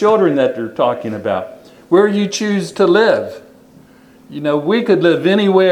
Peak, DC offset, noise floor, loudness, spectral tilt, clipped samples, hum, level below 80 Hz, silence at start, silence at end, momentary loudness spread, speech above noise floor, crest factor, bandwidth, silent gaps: 0 dBFS; under 0.1%; -44 dBFS; -15 LUFS; -5.5 dB/octave; under 0.1%; none; -62 dBFS; 0 s; 0 s; 10 LU; 31 dB; 14 dB; 12 kHz; none